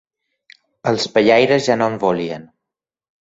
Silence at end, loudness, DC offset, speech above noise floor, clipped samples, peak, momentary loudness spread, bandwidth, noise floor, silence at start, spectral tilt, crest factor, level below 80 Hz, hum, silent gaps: 0.8 s; -16 LUFS; under 0.1%; 69 dB; under 0.1%; -2 dBFS; 13 LU; 8 kHz; -84 dBFS; 0.85 s; -5 dB/octave; 18 dB; -58 dBFS; none; none